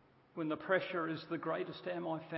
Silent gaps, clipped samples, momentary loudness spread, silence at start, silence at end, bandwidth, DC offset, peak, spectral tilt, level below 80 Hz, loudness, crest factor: none; under 0.1%; 7 LU; 0.35 s; 0 s; 5.6 kHz; under 0.1%; -18 dBFS; -4 dB/octave; -82 dBFS; -39 LUFS; 20 dB